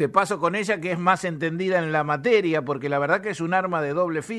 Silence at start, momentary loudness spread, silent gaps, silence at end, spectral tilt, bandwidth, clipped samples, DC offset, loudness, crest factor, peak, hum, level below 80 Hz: 0 s; 5 LU; none; 0 s; -5.5 dB/octave; 12.5 kHz; under 0.1%; under 0.1%; -23 LUFS; 20 dB; -4 dBFS; none; -66 dBFS